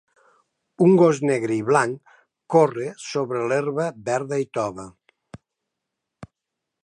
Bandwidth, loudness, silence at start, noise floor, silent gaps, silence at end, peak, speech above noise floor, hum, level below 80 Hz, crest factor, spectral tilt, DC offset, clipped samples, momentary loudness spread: 10.5 kHz; -21 LUFS; 0.8 s; -83 dBFS; none; 0.6 s; -2 dBFS; 63 dB; none; -66 dBFS; 20 dB; -6.5 dB/octave; under 0.1%; under 0.1%; 13 LU